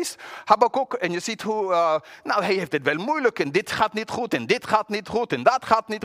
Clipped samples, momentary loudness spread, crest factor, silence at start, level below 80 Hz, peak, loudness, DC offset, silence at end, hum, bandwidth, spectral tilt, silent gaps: under 0.1%; 7 LU; 20 dB; 0 s; -62 dBFS; -4 dBFS; -23 LUFS; under 0.1%; 0 s; none; 16 kHz; -4 dB/octave; none